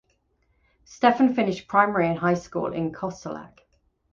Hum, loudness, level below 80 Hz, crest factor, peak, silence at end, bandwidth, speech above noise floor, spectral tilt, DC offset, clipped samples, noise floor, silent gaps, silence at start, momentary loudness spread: none; -23 LUFS; -60 dBFS; 22 dB; -4 dBFS; 0.65 s; 7.4 kHz; 45 dB; -6.5 dB/octave; under 0.1%; under 0.1%; -68 dBFS; none; 0.9 s; 14 LU